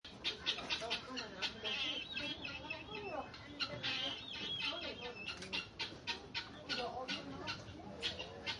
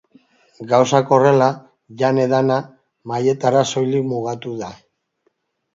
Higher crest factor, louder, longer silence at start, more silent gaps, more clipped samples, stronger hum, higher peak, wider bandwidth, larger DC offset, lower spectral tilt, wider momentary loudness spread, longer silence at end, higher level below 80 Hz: about the same, 20 dB vs 18 dB; second, -41 LUFS vs -17 LUFS; second, 0.05 s vs 0.6 s; neither; neither; neither; second, -24 dBFS vs 0 dBFS; first, 11.5 kHz vs 7.8 kHz; neither; second, -3 dB/octave vs -6 dB/octave; second, 7 LU vs 16 LU; second, 0 s vs 1 s; about the same, -68 dBFS vs -64 dBFS